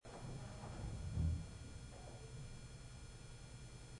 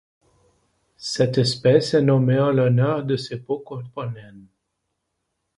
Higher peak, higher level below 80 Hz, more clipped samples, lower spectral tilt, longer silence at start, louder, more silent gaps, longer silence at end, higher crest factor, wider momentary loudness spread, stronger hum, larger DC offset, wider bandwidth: second, -30 dBFS vs -2 dBFS; about the same, -54 dBFS vs -58 dBFS; neither; about the same, -6 dB/octave vs -6.5 dB/octave; second, 0.05 s vs 1 s; second, -50 LUFS vs -20 LUFS; neither; second, 0 s vs 1.15 s; about the same, 18 dB vs 20 dB; about the same, 14 LU vs 15 LU; neither; neither; about the same, 11 kHz vs 11.5 kHz